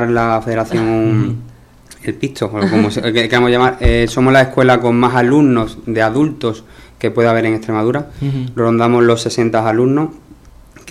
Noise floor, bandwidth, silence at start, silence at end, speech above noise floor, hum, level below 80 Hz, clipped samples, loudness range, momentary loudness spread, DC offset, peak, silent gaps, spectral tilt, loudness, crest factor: -41 dBFS; 13.5 kHz; 0 s; 0 s; 28 dB; none; -30 dBFS; under 0.1%; 4 LU; 10 LU; under 0.1%; 0 dBFS; none; -6.5 dB/octave; -14 LUFS; 14 dB